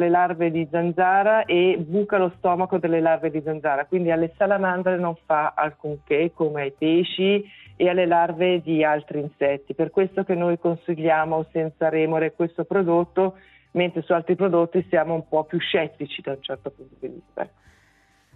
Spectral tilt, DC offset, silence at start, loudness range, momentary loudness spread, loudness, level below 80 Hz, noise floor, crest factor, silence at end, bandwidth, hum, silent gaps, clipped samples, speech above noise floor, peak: -9.5 dB/octave; under 0.1%; 0 s; 3 LU; 11 LU; -22 LUFS; -64 dBFS; -60 dBFS; 16 dB; 0.9 s; 4.1 kHz; none; none; under 0.1%; 38 dB; -6 dBFS